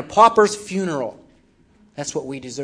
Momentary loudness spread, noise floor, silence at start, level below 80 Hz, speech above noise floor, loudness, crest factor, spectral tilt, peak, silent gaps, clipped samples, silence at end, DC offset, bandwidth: 17 LU; -56 dBFS; 0 s; -58 dBFS; 37 dB; -19 LUFS; 20 dB; -4 dB/octave; 0 dBFS; none; under 0.1%; 0 s; under 0.1%; 11 kHz